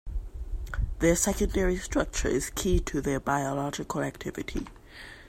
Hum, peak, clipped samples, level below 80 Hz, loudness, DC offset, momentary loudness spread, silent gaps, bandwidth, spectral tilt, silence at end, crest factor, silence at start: none; -10 dBFS; under 0.1%; -36 dBFS; -29 LUFS; under 0.1%; 14 LU; none; 16 kHz; -4.5 dB/octave; 0 s; 20 dB; 0.05 s